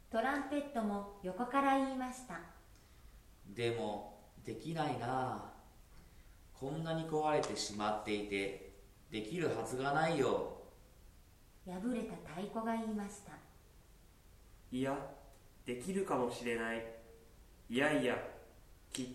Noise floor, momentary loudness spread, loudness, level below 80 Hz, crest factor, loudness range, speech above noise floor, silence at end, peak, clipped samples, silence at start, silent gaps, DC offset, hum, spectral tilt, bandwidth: -62 dBFS; 18 LU; -39 LUFS; -62 dBFS; 20 dB; 6 LU; 24 dB; 0 s; -20 dBFS; under 0.1%; 0.05 s; none; under 0.1%; none; -5 dB/octave; 16.5 kHz